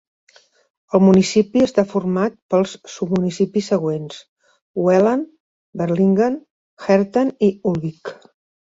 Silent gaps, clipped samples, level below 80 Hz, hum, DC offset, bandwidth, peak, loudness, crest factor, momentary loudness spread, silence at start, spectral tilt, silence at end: 2.42-2.49 s, 4.28-4.36 s, 4.62-4.74 s, 5.40-5.73 s, 6.50-6.77 s; under 0.1%; -56 dBFS; none; under 0.1%; 8 kHz; -2 dBFS; -18 LUFS; 16 dB; 15 LU; 0.95 s; -7 dB/octave; 0.5 s